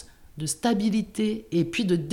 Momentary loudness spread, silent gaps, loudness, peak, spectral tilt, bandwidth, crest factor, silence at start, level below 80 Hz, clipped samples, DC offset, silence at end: 8 LU; none; -26 LUFS; -12 dBFS; -5 dB/octave; 16 kHz; 14 dB; 0 s; -54 dBFS; under 0.1%; under 0.1%; 0 s